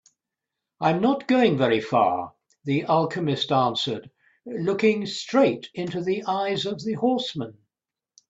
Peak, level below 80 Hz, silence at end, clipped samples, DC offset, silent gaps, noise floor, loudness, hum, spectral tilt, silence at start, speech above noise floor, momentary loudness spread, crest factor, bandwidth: -6 dBFS; -66 dBFS; 0.8 s; under 0.1%; under 0.1%; none; under -90 dBFS; -24 LUFS; none; -6 dB/octave; 0.8 s; over 67 dB; 10 LU; 18 dB; 8 kHz